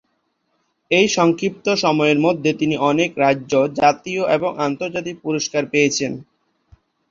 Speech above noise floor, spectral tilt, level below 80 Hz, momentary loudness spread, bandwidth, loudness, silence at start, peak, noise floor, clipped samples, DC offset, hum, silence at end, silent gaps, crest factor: 51 dB; -4.5 dB/octave; -60 dBFS; 8 LU; 7.6 kHz; -18 LUFS; 0.9 s; -2 dBFS; -69 dBFS; under 0.1%; under 0.1%; none; 0.9 s; none; 18 dB